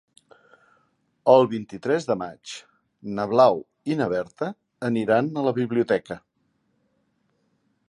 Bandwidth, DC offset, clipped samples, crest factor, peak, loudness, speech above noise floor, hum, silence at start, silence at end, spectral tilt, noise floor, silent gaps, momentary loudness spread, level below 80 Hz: 11.5 kHz; under 0.1%; under 0.1%; 22 dB; -2 dBFS; -23 LUFS; 48 dB; none; 1.25 s; 1.75 s; -6.5 dB/octave; -70 dBFS; none; 20 LU; -66 dBFS